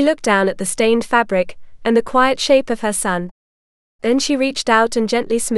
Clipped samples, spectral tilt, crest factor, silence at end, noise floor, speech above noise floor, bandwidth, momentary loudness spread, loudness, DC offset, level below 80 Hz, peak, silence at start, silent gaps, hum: under 0.1%; -3.5 dB/octave; 16 dB; 0 s; under -90 dBFS; over 74 dB; 13.5 kHz; 7 LU; -17 LUFS; under 0.1%; -46 dBFS; 0 dBFS; 0 s; 3.31-3.99 s; none